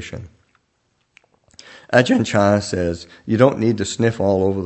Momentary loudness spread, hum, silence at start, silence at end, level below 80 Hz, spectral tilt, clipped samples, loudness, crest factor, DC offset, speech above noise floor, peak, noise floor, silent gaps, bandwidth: 11 LU; none; 0 s; 0 s; -50 dBFS; -6 dB/octave; under 0.1%; -18 LUFS; 20 dB; under 0.1%; 49 dB; 0 dBFS; -67 dBFS; none; 8.6 kHz